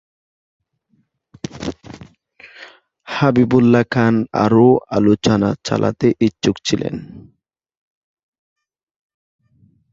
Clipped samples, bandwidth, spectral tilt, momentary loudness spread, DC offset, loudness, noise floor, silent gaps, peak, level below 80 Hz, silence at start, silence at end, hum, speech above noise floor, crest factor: under 0.1%; 7.8 kHz; -6.5 dB/octave; 17 LU; under 0.1%; -16 LUFS; -64 dBFS; none; -2 dBFS; -50 dBFS; 1.55 s; 2.7 s; none; 49 dB; 18 dB